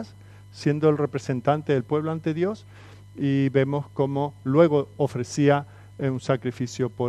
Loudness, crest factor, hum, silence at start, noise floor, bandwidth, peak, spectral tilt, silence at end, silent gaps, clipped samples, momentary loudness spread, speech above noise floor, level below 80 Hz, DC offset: -24 LUFS; 20 dB; 50 Hz at -45 dBFS; 0 s; -46 dBFS; 11 kHz; -4 dBFS; -7.5 dB/octave; 0 s; none; under 0.1%; 9 LU; 23 dB; -62 dBFS; under 0.1%